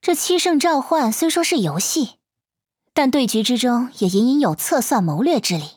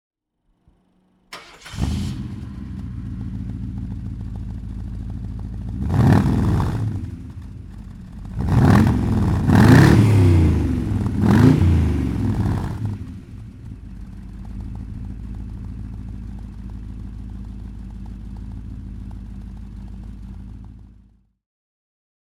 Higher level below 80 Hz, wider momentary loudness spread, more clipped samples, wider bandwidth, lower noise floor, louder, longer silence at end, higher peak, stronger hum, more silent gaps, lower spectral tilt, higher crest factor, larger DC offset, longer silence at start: second, -66 dBFS vs -30 dBFS; second, 3 LU vs 23 LU; neither; first, over 20 kHz vs 15 kHz; first, -85 dBFS vs -67 dBFS; about the same, -18 LUFS vs -19 LUFS; second, 0.05 s vs 1.45 s; second, -4 dBFS vs 0 dBFS; neither; neither; second, -4 dB/octave vs -8 dB/octave; second, 14 dB vs 20 dB; neither; second, 0.05 s vs 1.3 s